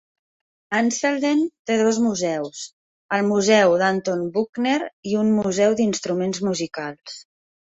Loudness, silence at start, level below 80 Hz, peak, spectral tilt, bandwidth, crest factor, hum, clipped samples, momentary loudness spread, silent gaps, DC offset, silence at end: -21 LUFS; 0.7 s; -64 dBFS; -4 dBFS; -4.5 dB/octave; 8 kHz; 18 dB; none; under 0.1%; 14 LU; 1.59-1.65 s, 2.73-3.09 s, 4.49-4.53 s, 4.93-5.03 s; under 0.1%; 0.45 s